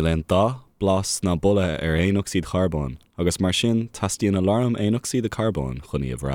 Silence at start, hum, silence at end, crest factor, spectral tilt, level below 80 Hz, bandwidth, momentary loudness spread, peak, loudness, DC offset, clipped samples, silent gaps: 0 s; none; 0 s; 14 dB; -5.5 dB/octave; -42 dBFS; 16.5 kHz; 7 LU; -8 dBFS; -23 LUFS; under 0.1%; under 0.1%; none